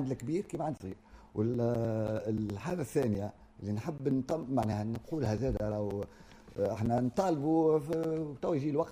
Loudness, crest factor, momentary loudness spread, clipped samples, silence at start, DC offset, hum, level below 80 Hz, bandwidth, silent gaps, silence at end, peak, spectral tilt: -33 LUFS; 16 dB; 10 LU; under 0.1%; 0 s; under 0.1%; none; -54 dBFS; 15.5 kHz; none; 0 s; -16 dBFS; -8 dB/octave